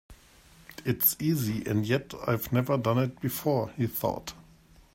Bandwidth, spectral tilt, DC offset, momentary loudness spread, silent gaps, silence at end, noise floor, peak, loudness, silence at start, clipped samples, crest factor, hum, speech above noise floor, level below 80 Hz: 16.5 kHz; -6 dB/octave; under 0.1%; 9 LU; none; 0.55 s; -57 dBFS; -12 dBFS; -28 LUFS; 0.1 s; under 0.1%; 18 dB; none; 29 dB; -58 dBFS